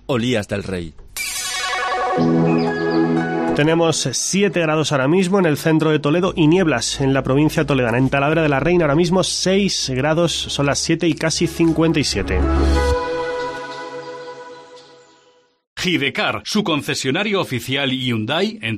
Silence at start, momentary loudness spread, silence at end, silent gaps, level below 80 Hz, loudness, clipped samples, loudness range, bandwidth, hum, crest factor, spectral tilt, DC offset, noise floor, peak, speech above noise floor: 0.1 s; 9 LU; 0 s; 15.67-15.76 s; -32 dBFS; -18 LUFS; under 0.1%; 6 LU; 14.5 kHz; none; 16 dB; -4.5 dB/octave; under 0.1%; -55 dBFS; -4 dBFS; 38 dB